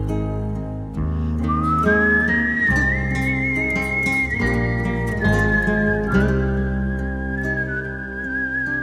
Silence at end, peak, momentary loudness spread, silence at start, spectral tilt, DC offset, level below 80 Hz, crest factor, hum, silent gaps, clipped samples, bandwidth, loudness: 0 s; -4 dBFS; 9 LU; 0 s; -7.5 dB/octave; under 0.1%; -30 dBFS; 16 dB; none; none; under 0.1%; 14 kHz; -20 LUFS